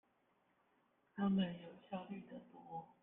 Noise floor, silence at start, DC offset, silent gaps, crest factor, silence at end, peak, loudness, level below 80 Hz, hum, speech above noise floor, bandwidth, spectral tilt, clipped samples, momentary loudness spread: -79 dBFS; 1.15 s; under 0.1%; none; 18 dB; 0.15 s; -28 dBFS; -43 LUFS; -80 dBFS; none; 35 dB; 3.8 kHz; -9.5 dB/octave; under 0.1%; 19 LU